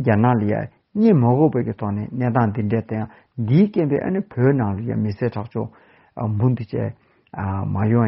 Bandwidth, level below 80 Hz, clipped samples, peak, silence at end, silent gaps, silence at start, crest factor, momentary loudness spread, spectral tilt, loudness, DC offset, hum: 5.8 kHz; -54 dBFS; under 0.1%; -2 dBFS; 0 s; none; 0 s; 18 dB; 12 LU; -9.5 dB/octave; -21 LUFS; under 0.1%; none